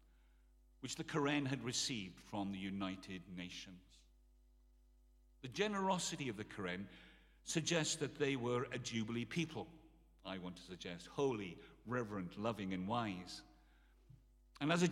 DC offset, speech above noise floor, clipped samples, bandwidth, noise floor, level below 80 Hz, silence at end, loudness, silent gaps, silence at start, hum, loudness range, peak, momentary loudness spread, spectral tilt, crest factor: under 0.1%; 27 dB; under 0.1%; 15.5 kHz; -69 dBFS; -68 dBFS; 0 s; -42 LUFS; none; 0.8 s; none; 5 LU; -20 dBFS; 15 LU; -4 dB/octave; 24 dB